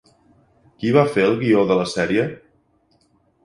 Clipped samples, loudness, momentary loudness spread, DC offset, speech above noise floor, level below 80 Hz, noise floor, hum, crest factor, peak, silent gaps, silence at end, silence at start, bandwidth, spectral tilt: under 0.1%; -19 LUFS; 7 LU; under 0.1%; 44 dB; -56 dBFS; -62 dBFS; none; 20 dB; -2 dBFS; none; 1.05 s; 0.8 s; 11.5 kHz; -6.5 dB/octave